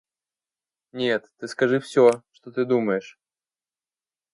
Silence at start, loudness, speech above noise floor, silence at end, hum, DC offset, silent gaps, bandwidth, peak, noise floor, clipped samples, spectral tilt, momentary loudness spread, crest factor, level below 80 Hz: 0.95 s; -23 LUFS; over 68 dB; 1.25 s; none; under 0.1%; none; 11.5 kHz; -4 dBFS; under -90 dBFS; under 0.1%; -5.5 dB/octave; 15 LU; 20 dB; -76 dBFS